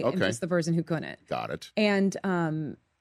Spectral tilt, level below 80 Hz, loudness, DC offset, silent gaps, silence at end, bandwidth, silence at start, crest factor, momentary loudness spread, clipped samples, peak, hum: -6 dB/octave; -66 dBFS; -29 LUFS; under 0.1%; none; 0.25 s; 13 kHz; 0 s; 16 dB; 10 LU; under 0.1%; -12 dBFS; none